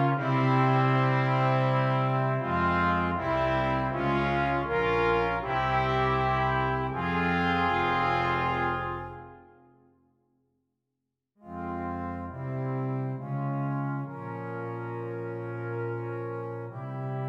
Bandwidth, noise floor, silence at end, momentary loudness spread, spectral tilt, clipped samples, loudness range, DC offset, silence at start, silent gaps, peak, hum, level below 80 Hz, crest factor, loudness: 6.6 kHz; -84 dBFS; 0 s; 11 LU; -8 dB/octave; under 0.1%; 11 LU; under 0.1%; 0 s; none; -10 dBFS; none; -48 dBFS; 18 dB; -28 LUFS